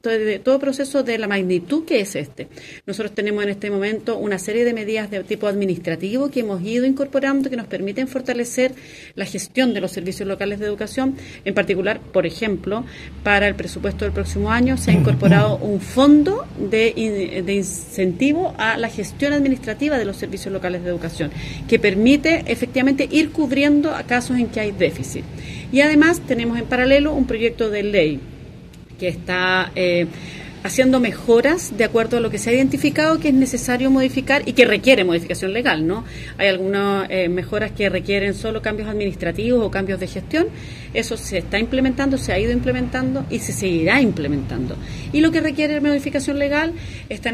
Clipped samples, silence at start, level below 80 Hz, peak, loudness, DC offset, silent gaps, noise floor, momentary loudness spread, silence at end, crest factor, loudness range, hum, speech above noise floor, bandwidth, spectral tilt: under 0.1%; 0.05 s; -40 dBFS; 0 dBFS; -19 LUFS; under 0.1%; none; -39 dBFS; 11 LU; 0 s; 20 dB; 6 LU; none; 20 dB; 14.5 kHz; -5.5 dB/octave